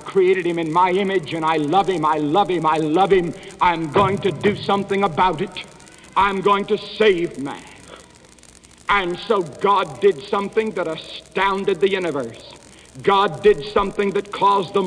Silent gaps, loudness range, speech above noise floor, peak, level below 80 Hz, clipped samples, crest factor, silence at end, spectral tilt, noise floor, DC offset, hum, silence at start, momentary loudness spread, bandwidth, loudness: none; 3 LU; 28 dB; -4 dBFS; -48 dBFS; under 0.1%; 16 dB; 0 s; -5.5 dB/octave; -47 dBFS; under 0.1%; none; 0 s; 11 LU; 10.5 kHz; -19 LUFS